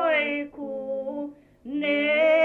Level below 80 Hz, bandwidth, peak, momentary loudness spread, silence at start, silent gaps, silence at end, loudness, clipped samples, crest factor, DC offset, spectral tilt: -66 dBFS; 4.5 kHz; -12 dBFS; 15 LU; 0 s; none; 0 s; -26 LUFS; under 0.1%; 14 dB; under 0.1%; -5.5 dB/octave